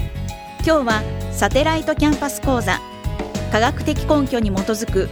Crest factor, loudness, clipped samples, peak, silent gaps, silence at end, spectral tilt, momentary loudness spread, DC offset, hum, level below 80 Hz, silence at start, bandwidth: 20 dB; -20 LUFS; under 0.1%; 0 dBFS; none; 0 s; -5 dB/octave; 9 LU; under 0.1%; none; -30 dBFS; 0 s; over 20 kHz